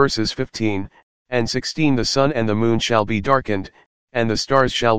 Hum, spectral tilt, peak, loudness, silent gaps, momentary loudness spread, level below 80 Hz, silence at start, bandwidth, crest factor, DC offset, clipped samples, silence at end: none; -5 dB/octave; 0 dBFS; -20 LUFS; 1.03-1.25 s, 3.86-4.07 s; 9 LU; -42 dBFS; 0 s; 15.5 kHz; 18 dB; 2%; under 0.1%; 0 s